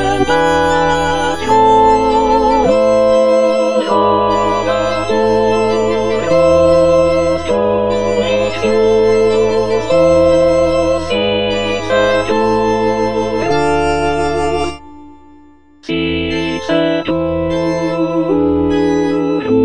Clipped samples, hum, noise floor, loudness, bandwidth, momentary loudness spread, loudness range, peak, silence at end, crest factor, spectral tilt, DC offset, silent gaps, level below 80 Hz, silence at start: under 0.1%; none; -44 dBFS; -13 LUFS; 10.5 kHz; 6 LU; 6 LU; 0 dBFS; 0 s; 12 dB; -5.5 dB/octave; 2%; none; -34 dBFS; 0 s